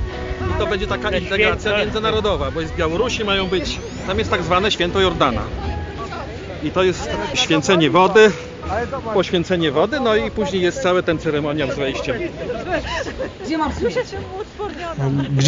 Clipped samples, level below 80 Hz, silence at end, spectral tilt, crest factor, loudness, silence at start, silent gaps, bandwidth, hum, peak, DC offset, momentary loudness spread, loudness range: under 0.1%; -34 dBFS; 0 s; -5 dB/octave; 16 dB; -19 LUFS; 0 s; none; 7.6 kHz; none; -2 dBFS; under 0.1%; 12 LU; 6 LU